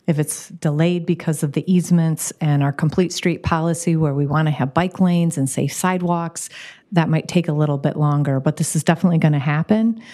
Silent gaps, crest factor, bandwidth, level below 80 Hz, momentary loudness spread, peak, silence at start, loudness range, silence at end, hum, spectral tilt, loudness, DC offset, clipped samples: none; 18 dB; 14 kHz; -50 dBFS; 5 LU; -2 dBFS; 0.1 s; 1 LU; 0 s; none; -6 dB/octave; -19 LUFS; under 0.1%; under 0.1%